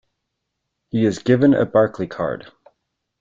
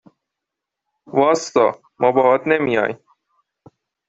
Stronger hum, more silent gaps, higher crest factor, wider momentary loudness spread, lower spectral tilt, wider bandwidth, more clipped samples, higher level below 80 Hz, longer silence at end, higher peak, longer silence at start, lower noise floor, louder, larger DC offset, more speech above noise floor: neither; neither; about the same, 18 dB vs 18 dB; first, 11 LU vs 8 LU; first, -7.5 dB/octave vs -5 dB/octave; about the same, 7.6 kHz vs 8 kHz; neither; first, -56 dBFS vs -62 dBFS; second, 0.8 s vs 1.15 s; about the same, -2 dBFS vs -2 dBFS; second, 0.95 s vs 1.1 s; second, -78 dBFS vs -83 dBFS; about the same, -19 LUFS vs -18 LUFS; neither; second, 60 dB vs 66 dB